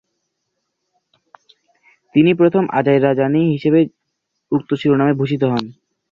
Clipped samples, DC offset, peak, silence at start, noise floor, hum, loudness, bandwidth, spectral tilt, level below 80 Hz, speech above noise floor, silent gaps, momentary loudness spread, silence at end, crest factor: under 0.1%; under 0.1%; -2 dBFS; 2.15 s; -74 dBFS; none; -16 LUFS; 7 kHz; -9 dB/octave; -58 dBFS; 59 dB; none; 8 LU; 0.4 s; 16 dB